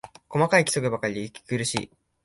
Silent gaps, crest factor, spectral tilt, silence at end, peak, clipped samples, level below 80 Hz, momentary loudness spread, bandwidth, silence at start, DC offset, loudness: none; 20 dB; -4 dB/octave; 0.4 s; -6 dBFS; under 0.1%; -60 dBFS; 12 LU; 11.5 kHz; 0.05 s; under 0.1%; -25 LUFS